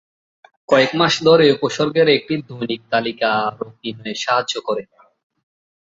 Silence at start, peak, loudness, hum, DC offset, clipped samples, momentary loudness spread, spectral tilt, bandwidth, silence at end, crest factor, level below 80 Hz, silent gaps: 0.7 s; 0 dBFS; -17 LUFS; none; under 0.1%; under 0.1%; 13 LU; -4.5 dB/octave; 7.8 kHz; 1.05 s; 18 dB; -60 dBFS; none